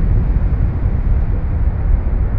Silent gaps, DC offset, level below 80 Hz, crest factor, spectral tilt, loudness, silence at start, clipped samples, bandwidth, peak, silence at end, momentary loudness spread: none; under 0.1%; -16 dBFS; 12 dB; -11.5 dB/octave; -18 LUFS; 0 s; under 0.1%; 2.8 kHz; -2 dBFS; 0 s; 2 LU